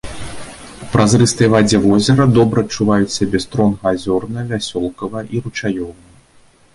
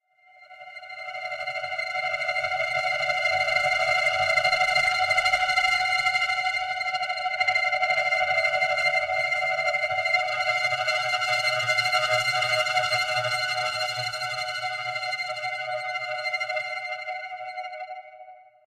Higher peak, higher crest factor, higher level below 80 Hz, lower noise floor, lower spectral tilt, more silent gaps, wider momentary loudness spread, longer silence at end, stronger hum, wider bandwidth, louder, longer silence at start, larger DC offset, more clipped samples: first, -2 dBFS vs -10 dBFS; about the same, 14 dB vs 16 dB; first, -40 dBFS vs -60 dBFS; second, -49 dBFS vs -55 dBFS; first, -5.5 dB/octave vs -0.5 dB/octave; neither; first, 18 LU vs 11 LU; first, 0.8 s vs 0.25 s; neither; second, 11.5 kHz vs 15.5 kHz; first, -15 LUFS vs -24 LUFS; second, 0.05 s vs 0.4 s; neither; neither